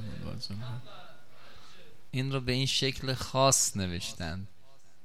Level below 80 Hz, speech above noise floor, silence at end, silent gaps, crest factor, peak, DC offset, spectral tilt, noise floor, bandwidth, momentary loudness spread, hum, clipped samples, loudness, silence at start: -54 dBFS; 26 dB; 0 s; none; 22 dB; -12 dBFS; 0.7%; -3.5 dB/octave; -57 dBFS; 16 kHz; 19 LU; none; under 0.1%; -30 LUFS; 0 s